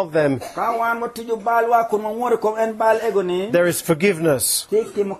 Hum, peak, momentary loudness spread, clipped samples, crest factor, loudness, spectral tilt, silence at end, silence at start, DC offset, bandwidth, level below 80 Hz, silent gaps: none; -4 dBFS; 5 LU; under 0.1%; 16 dB; -19 LUFS; -4 dB/octave; 0 s; 0 s; under 0.1%; 14 kHz; -60 dBFS; none